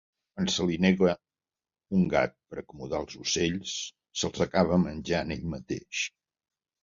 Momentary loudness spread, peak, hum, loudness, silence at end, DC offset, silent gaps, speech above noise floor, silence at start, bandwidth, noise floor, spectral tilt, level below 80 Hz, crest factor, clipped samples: 12 LU; -8 dBFS; none; -29 LUFS; 0.75 s; under 0.1%; none; over 62 dB; 0.35 s; 7.6 kHz; under -90 dBFS; -5 dB/octave; -52 dBFS; 22 dB; under 0.1%